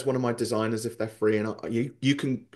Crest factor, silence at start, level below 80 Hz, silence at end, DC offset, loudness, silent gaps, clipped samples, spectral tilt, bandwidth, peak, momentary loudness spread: 18 dB; 0 s; -68 dBFS; 0.1 s; under 0.1%; -28 LUFS; none; under 0.1%; -6 dB/octave; 12.5 kHz; -10 dBFS; 4 LU